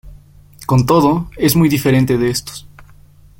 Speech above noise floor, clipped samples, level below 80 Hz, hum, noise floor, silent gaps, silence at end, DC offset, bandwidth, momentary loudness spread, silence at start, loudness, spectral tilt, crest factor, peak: 30 dB; under 0.1%; -40 dBFS; none; -43 dBFS; none; 0.6 s; under 0.1%; 17 kHz; 16 LU; 0.05 s; -14 LUFS; -6 dB/octave; 14 dB; -2 dBFS